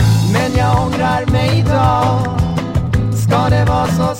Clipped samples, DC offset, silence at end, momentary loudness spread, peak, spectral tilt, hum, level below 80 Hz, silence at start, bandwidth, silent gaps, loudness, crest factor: under 0.1%; under 0.1%; 0 s; 4 LU; -2 dBFS; -6.5 dB/octave; none; -26 dBFS; 0 s; 16 kHz; none; -14 LUFS; 12 dB